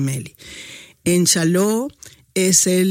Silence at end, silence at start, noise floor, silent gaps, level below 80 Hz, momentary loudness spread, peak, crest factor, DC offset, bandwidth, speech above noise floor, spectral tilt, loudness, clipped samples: 0 s; 0 s; -39 dBFS; none; -54 dBFS; 21 LU; 0 dBFS; 18 dB; under 0.1%; 16.5 kHz; 22 dB; -4 dB/octave; -17 LUFS; under 0.1%